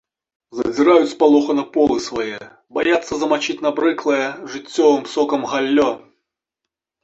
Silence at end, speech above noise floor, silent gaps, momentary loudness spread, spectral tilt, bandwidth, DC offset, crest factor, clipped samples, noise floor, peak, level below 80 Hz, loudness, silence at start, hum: 1.05 s; 66 dB; none; 12 LU; -4 dB/octave; 8 kHz; under 0.1%; 18 dB; under 0.1%; -83 dBFS; -2 dBFS; -56 dBFS; -18 LUFS; 0.55 s; none